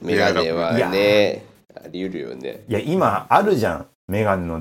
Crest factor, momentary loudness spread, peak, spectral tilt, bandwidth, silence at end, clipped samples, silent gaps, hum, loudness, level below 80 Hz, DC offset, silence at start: 18 dB; 15 LU; -2 dBFS; -6 dB/octave; 16.5 kHz; 0 s; under 0.1%; 3.95-4.08 s; none; -20 LUFS; -54 dBFS; under 0.1%; 0 s